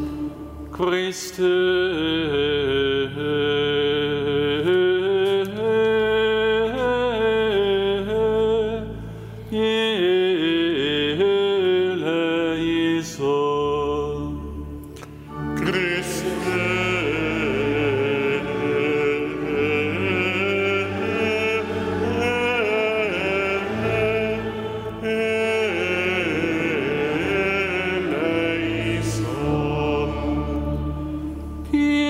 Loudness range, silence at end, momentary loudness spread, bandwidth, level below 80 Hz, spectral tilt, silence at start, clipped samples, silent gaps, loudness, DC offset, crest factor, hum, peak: 4 LU; 0 s; 9 LU; 16 kHz; -40 dBFS; -5.5 dB/octave; 0 s; under 0.1%; none; -22 LUFS; under 0.1%; 12 dB; none; -10 dBFS